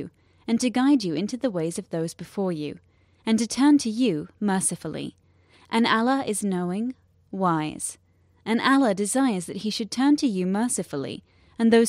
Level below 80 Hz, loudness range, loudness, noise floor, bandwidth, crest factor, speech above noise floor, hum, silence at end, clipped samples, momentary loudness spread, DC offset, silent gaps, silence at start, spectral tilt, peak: -64 dBFS; 2 LU; -24 LUFS; -57 dBFS; 15.5 kHz; 18 dB; 34 dB; none; 0 s; under 0.1%; 13 LU; under 0.1%; none; 0 s; -4.5 dB/octave; -6 dBFS